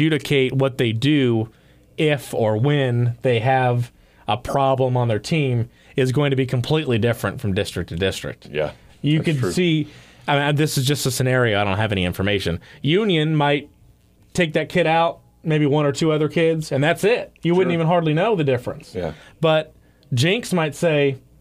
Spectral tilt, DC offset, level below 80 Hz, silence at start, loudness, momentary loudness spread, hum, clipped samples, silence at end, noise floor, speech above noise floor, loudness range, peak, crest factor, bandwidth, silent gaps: -6 dB/octave; under 0.1%; -50 dBFS; 0 s; -20 LUFS; 9 LU; none; under 0.1%; 0.25 s; -53 dBFS; 34 dB; 3 LU; -6 dBFS; 14 dB; 15.5 kHz; none